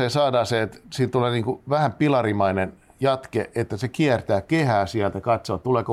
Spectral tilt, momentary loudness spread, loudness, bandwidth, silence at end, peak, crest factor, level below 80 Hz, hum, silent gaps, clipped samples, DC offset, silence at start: -6.5 dB/octave; 7 LU; -23 LUFS; 13.5 kHz; 0 s; -8 dBFS; 14 dB; -54 dBFS; none; none; under 0.1%; under 0.1%; 0 s